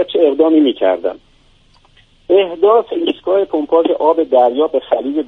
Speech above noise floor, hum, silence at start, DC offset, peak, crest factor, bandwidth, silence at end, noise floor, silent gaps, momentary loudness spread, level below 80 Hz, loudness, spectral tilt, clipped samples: 37 dB; none; 0 s; under 0.1%; 0 dBFS; 14 dB; 4.2 kHz; 0 s; -50 dBFS; none; 6 LU; -54 dBFS; -14 LUFS; -7 dB/octave; under 0.1%